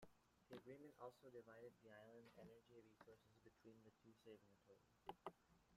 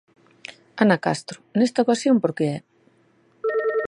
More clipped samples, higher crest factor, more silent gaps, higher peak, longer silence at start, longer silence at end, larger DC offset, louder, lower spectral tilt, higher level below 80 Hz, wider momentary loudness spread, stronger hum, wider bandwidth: neither; first, 26 dB vs 20 dB; neither; second, -38 dBFS vs -2 dBFS; second, 0 s vs 0.5 s; about the same, 0 s vs 0 s; neither; second, -64 LUFS vs -22 LUFS; about the same, -6 dB/octave vs -6 dB/octave; second, -88 dBFS vs -70 dBFS; second, 9 LU vs 19 LU; neither; first, 14 kHz vs 11 kHz